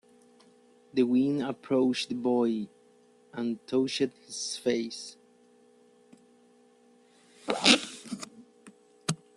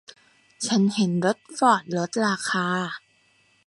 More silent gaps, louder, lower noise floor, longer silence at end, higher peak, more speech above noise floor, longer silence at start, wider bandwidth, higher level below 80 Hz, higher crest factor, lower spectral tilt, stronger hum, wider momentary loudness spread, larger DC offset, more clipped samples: neither; second, -28 LUFS vs -24 LUFS; about the same, -61 dBFS vs -62 dBFS; second, 0.2 s vs 0.7 s; about the same, -6 dBFS vs -4 dBFS; second, 33 dB vs 39 dB; first, 0.95 s vs 0.6 s; about the same, 12 kHz vs 11.5 kHz; about the same, -74 dBFS vs -72 dBFS; first, 26 dB vs 20 dB; about the same, -3.5 dB/octave vs -4.5 dB/octave; neither; first, 17 LU vs 9 LU; neither; neither